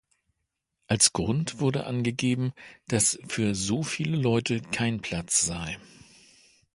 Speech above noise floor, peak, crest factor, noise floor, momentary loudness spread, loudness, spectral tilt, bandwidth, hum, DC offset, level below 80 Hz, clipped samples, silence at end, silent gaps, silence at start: 55 dB; -4 dBFS; 24 dB; -82 dBFS; 10 LU; -26 LUFS; -3.5 dB/octave; 12 kHz; none; under 0.1%; -54 dBFS; under 0.1%; 0.9 s; none; 0.9 s